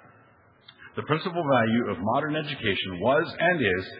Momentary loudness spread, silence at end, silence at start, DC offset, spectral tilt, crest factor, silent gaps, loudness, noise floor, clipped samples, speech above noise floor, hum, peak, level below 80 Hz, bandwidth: 6 LU; 0 s; 0.8 s; under 0.1%; -9.5 dB/octave; 20 dB; none; -25 LUFS; -58 dBFS; under 0.1%; 32 dB; none; -6 dBFS; -62 dBFS; 5.4 kHz